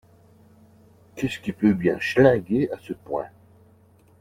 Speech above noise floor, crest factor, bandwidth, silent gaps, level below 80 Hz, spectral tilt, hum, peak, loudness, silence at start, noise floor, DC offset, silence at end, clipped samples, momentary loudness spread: 34 dB; 22 dB; 16 kHz; none; -56 dBFS; -7 dB/octave; none; -4 dBFS; -23 LUFS; 1.15 s; -56 dBFS; under 0.1%; 0.95 s; under 0.1%; 15 LU